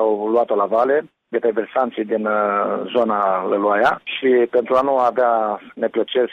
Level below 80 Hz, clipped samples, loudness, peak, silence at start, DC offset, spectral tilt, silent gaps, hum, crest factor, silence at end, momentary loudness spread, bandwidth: -64 dBFS; under 0.1%; -19 LUFS; -6 dBFS; 0 s; under 0.1%; -6.5 dB/octave; none; none; 12 dB; 0 s; 5 LU; 7 kHz